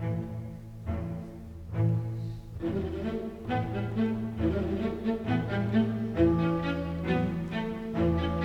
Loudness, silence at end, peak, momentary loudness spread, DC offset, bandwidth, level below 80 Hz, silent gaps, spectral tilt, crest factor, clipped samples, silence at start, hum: -31 LUFS; 0 s; -12 dBFS; 11 LU; under 0.1%; 8.2 kHz; -48 dBFS; none; -9 dB/octave; 18 dB; under 0.1%; 0 s; none